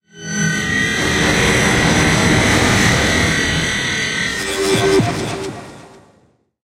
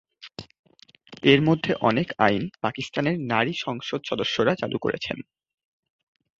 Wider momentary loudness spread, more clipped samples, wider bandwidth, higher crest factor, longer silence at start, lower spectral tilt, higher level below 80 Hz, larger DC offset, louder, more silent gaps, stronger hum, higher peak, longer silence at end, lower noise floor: second, 8 LU vs 15 LU; neither; first, 16 kHz vs 7.8 kHz; second, 16 dB vs 24 dB; about the same, 0.15 s vs 0.2 s; second, -3.5 dB/octave vs -6 dB/octave; first, -32 dBFS vs -60 dBFS; neither; first, -15 LUFS vs -24 LUFS; second, none vs 0.59-0.64 s; neither; about the same, -2 dBFS vs -2 dBFS; second, 0.8 s vs 1.2 s; first, -55 dBFS vs -51 dBFS